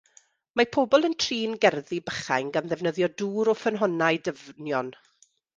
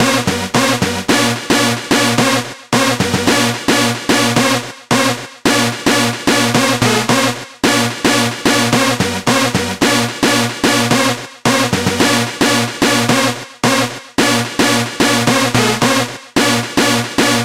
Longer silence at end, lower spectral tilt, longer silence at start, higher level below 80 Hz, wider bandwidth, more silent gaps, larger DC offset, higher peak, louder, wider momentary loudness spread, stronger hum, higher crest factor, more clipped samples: first, 0.65 s vs 0 s; about the same, -4.5 dB/octave vs -3.5 dB/octave; first, 0.55 s vs 0 s; second, -66 dBFS vs -46 dBFS; second, 9.6 kHz vs 16.5 kHz; neither; second, under 0.1% vs 0.3%; second, -6 dBFS vs 0 dBFS; second, -26 LUFS vs -13 LUFS; first, 10 LU vs 4 LU; neither; first, 20 dB vs 14 dB; neither